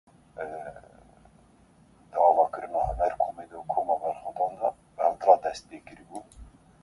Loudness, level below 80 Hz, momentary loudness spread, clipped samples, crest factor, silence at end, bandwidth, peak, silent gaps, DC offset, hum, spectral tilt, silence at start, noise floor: -27 LUFS; -50 dBFS; 22 LU; under 0.1%; 22 dB; 0.4 s; 11.5 kHz; -6 dBFS; none; under 0.1%; none; -5.5 dB/octave; 0.35 s; -58 dBFS